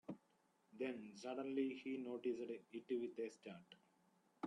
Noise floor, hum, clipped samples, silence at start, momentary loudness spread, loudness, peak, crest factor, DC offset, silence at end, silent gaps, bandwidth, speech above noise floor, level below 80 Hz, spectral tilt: -79 dBFS; none; under 0.1%; 0.1 s; 15 LU; -47 LUFS; -30 dBFS; 18 dB; under 0.1%; 0 s; none; 10.5 kHz; 33 dB; under -90 dBFS; -6 dB/octave